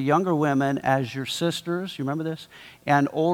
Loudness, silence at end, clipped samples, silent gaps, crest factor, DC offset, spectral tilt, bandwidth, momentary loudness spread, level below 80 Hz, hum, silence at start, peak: -25 LUFS; 0 s; under 0.1%; none; 18 dB; under 0.1%; -6 dB/octave; 17 kHz; 11 LU; -64 dBFS; none; 0 s; -6 dBFS